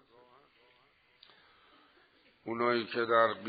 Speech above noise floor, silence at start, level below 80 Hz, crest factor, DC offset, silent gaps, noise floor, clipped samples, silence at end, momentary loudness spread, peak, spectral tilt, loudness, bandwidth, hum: 38 dB; 2.45 s; -82 dBFS; 24 dB; under 0.1%; none; -68 dBFS; under 0.1%; 0 s; 15 LU; -12 dBFS; -2 dB/octave; -31 LUFS; 4.8 kHz; none